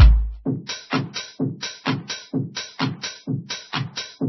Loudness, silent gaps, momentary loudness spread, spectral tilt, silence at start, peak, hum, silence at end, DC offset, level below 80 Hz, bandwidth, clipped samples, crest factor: -26 LUFS; none; 5 LU; -5 dB/octave; 0 s; 0 dBFS; none; 0 s; under 0.1%; -24 dBFS; 6.2 kHz; under 0.1%; 20 dB